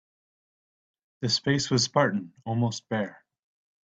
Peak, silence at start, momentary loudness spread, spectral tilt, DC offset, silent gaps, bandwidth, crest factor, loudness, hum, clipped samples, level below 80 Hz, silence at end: -6 dBFS; 1.2 s; 10 LU; -4.5 dB/octave; under 0.1%; none; 9 kHz; 22 dB; -27 LUFS; none; under 0.1%; -66 dBFS; 0.7 s